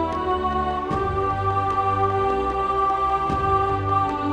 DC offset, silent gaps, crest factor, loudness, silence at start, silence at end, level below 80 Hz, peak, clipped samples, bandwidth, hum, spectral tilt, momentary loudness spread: under 0.1%; none; 14 dB; -22 LUFS; 0 s; 0 s; -38 dBFS; -8 dBFS; under 0.1%; 9.8 kHz; none; -7.5 dB/octave; 3 LU